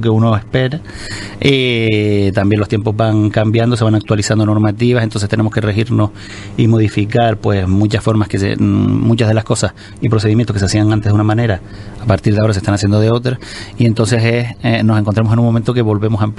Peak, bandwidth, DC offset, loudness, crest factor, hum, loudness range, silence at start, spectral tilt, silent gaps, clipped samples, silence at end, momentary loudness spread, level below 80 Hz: 0 dBFS; 11.5 kHz; under 0.1%; -14 LUFS; 12 dB; none; 1 LU; 0 s; -6.5 dB/octave; none; under 0.1%; 0 s; 5 LU; -38 dBFS